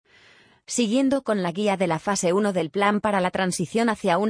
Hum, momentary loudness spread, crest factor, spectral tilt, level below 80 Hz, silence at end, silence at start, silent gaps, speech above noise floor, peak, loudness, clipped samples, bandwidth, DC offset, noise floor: none; 3 LU; 16 dB; -4.5 dB/octave; -60 dBFS; 0 s; 0.7 s; none; 33 dB; -6 dBFS; -23 LUFS; under 0.1%; 10.5 kHz; under 0.1%; -55 dBFS